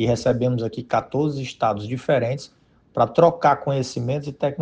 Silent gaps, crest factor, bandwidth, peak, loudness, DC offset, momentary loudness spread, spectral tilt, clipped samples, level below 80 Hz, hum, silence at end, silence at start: none; 20 dB; 9.4 kHz; -2 dBFS; -22 LUFS; under 0.1%; 10 LU; -6.5 dB/octave; under 0.1%; -54 dBFS; none; 0 s; 0 s